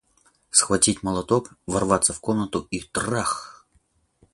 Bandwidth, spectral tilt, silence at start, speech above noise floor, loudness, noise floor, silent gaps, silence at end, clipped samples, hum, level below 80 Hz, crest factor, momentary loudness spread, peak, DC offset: 11.5 kHz; -3.5 dB/octave; 0.55 s; 41 dB; -22 LUFS; -65 dBFS; none; 0.8 s; under 0.1%; none; -50 dBFS; 24 dB; 9 LU; -2 dBFS; under 0.1%